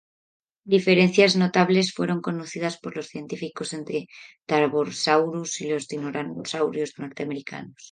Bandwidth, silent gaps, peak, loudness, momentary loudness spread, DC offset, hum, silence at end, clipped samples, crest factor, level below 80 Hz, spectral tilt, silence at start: 9.6 kHz; none; -4 dBFS; -24 LUFS; 15 LU; under 0.1%; none; 0.05 s; under 0.1%; 22 dB; -70 dBFS; -5 dB/octave; 0.65 s